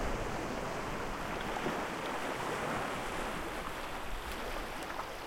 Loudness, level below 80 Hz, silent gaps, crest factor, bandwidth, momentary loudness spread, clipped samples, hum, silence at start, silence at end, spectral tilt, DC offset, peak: -38 LUFS; -46 dBFS; none; 16 dB; 16.5 kHz; 4 LU; under 0.1%; none; 0 s; 0 s; -4 dB/octave; under 0.1%; -22 dBFS